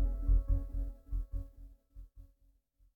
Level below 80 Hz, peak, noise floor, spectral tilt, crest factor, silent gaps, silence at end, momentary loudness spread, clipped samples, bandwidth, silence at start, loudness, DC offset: -36 dBFS; -20 dBFS; -70 dBFS; -10.5 dB/octave; 16 dB; none; 0.75 s; 25 LU; under 0.1%; 1.4 kHz; 0 s; -38 LUFS; under 0.1%